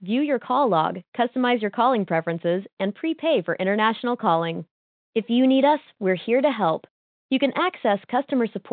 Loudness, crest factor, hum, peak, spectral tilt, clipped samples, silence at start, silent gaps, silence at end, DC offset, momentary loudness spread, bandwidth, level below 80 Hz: -23 LUFS; 16 dB; none; -6 dBFS; -10 dB/octave; under 0.1%; 0 s; 1.08-1.12 s, 2.73-2.77 s, 4.71-5.13 s, 6.90-7.29 s; 0 s; under 0.1%; 7 LU; 4.6 kHz; -78 dBFS